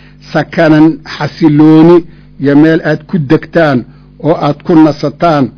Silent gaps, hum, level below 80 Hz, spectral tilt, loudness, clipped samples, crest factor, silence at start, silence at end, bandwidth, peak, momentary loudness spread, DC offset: none; none; -40 dBFS; -8.5 dB/octave; -8 LUFS; 7%; 8 dB; 0.3 s; 0.1 s; 5.4 kHz; 0 dBFS; 11 LU; under 0.1%